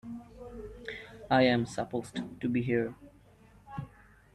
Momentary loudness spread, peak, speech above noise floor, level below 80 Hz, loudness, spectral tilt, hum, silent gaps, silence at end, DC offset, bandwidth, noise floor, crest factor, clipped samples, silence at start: 20 LU; -12 dBFS; 29 dB; -58 dBFS; -31 LUFS; -6.5 dB/octave; none; none; 0.45 s; under 0.1%; 12 kHz; -59 dBFS; 20 dB; under 0.1%; 0.05 s